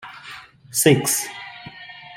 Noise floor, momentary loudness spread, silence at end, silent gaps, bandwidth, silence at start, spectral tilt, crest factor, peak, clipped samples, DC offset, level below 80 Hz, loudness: -41 dBFS; 22 LU; 0 s; none; 16.5 kHz; 0.05 s; -3.5 dB/octave; 20 dB; -2 dBFS; under 0.1%; under 0.1%; -60 dBFS; -19 LUFS